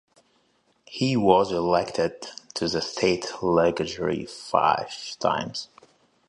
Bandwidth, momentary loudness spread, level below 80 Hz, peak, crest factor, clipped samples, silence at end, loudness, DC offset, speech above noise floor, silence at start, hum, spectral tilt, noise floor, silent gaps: 11 kHz; 14 LU; -56 dBFS; -4 dBFS; 22 dB; under 0.1%; 0.65 s; -24 LUFS; under 0.1%; 42 dB; 0.9 s; none; -5 dB/octave; -67 dBFS; none